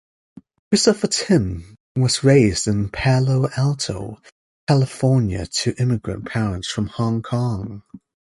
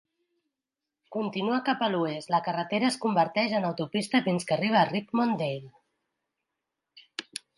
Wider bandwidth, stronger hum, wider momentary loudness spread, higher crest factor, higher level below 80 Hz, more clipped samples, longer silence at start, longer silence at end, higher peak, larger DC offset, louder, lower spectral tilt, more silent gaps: about the same, 11.5 kHz vs 11.5 kHz; neither; about the same, 13 LU vs 13 LU; about the same, 18 dB vs 20 dB; first, -42 dBFS vs -76 dBFS; neither; second, 0.7 s vs 1.1 s; about the same, 0.3 s vs 0.2 s; first, -2 dBFS vs -10 dBFS; neither; first, -20 LUFS vs -27 LUFS; about the same, -5.5 dB/octave vs -5.5 dB/octave; first, 1.80-1.95 s, 4.32-4.67 s vs none